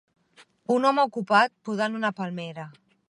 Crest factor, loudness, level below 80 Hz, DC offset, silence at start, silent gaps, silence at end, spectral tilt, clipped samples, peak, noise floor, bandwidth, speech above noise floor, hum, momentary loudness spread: 20 dB; -25 LUFS; -80 dBFS; under 0.1%; 0.7 s; none; 0.4 s; -5.5 dB/octave; under 0.1%; -6 dBFS; -58 dBFS; 11.5 kHz; 34 dB; none; 18 LU